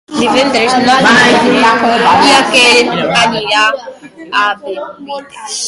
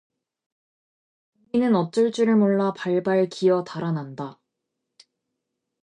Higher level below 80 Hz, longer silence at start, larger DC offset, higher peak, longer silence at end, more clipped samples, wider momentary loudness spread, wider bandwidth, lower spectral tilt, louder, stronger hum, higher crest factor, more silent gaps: first, -48 dBFS vs -70 dBFS; second, 0.1 s vs 1.55 s; neither; first, 0 dBFS vs -10 dBFS; second, 0 s vs 1.5 s; first, 0.1% vs under 0.1%; first, 17 LU vs 10 LU; first, 16 kHz vs 10 kHz; second, -2.5 dB/octave vs -7 dB/octave; first, -8 LUFS vs -22 LUFS; neither; second, 10 dB vs 16 dB; neither